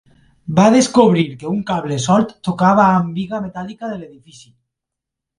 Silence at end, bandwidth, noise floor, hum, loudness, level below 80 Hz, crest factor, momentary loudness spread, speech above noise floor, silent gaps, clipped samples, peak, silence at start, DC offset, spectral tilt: 1.3 s; 11.5 kHz; -82 dBFS; none; -15 LUFS; -52 dBFS; 16 dB; 16 LU; 67 dB; none; under 0.1%; 0 dBFS; 0.45 s; under 0.1%; -6 dB/octave